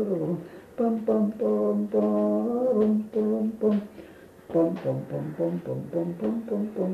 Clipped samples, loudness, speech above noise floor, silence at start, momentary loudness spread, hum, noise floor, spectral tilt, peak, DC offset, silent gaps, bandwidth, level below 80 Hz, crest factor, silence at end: under 0.1%; -27 LUFS; 21 dB; 0 s; 8 LU; none; -47 dBFS; -10 dB/octave; -12 dBFS; under 0.1%; none; 5.2 kHz; -64 dBFS; 14 dB; 0 s